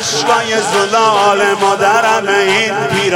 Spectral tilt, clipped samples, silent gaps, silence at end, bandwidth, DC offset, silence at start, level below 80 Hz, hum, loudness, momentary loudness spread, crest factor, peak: -2.5 dB/octave; under 0.1%; none; 0 s; 17 kHz; under 0.1%; 0 s; -56 dBFS; none; -11 LUFS; 3 LU; 12 dB; 0 dBFS